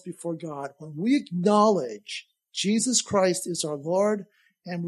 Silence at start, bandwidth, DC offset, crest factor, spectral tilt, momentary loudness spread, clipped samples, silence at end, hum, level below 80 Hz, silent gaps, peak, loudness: 0.05 s; 13.5 kHz; under 0.1%; 18 dB; -4 dB/octave; 16 LU; under 0.1%; 0 s; none; -70 dBFS; none; -8 dBFS; -25 LUFS